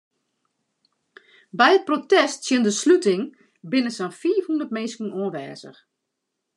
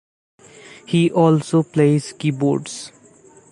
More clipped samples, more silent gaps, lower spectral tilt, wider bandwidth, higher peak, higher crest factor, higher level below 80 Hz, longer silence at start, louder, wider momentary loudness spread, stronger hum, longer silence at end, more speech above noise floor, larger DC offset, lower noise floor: neither; neither; second, -3.5 dB/octave vs -7 dB/octave; about the same, 11 kHz vs 11.5 kHz; about the same, -2 dBFS vs -2 dBFS; first, 22 dB vs 16 dB; second, -86 dBFS vs -64 dBFS; first, 1.55 s vs 0.9 s; second, -21 LUFS vs -18 LUFS; about the same, 16 LU vs 15 LU; neither; first, 0.85 s vs 0.65 s; first, 59 dB vs 31 dB; neither; first, -80 dBFS vs -48 dBFS